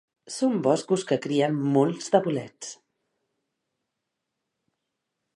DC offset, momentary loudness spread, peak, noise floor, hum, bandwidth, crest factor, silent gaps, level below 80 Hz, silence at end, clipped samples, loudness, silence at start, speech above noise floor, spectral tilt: under 0.1%; 15 LU; -6 dBFS; -83 dBFS; none; 11.5 kHz; 22 dB; none; -78 dBFS; 2.6 s; under 0.1%; -25 LUFS; 0.25 s; 59 dB; -6 dB/octave